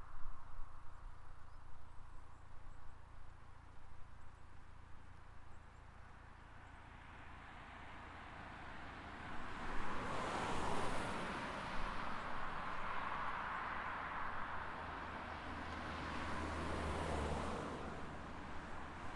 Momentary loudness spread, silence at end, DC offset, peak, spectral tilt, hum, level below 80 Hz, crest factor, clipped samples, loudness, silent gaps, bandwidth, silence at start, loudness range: 19 LU; 0 s; under 0.1%; -26 dBFS; -5 dB/octave; none; -54 dBFS; 16 dB; under 0.1%; -46 LUFS; none; 11.5 kHz; 0 s; 17 LU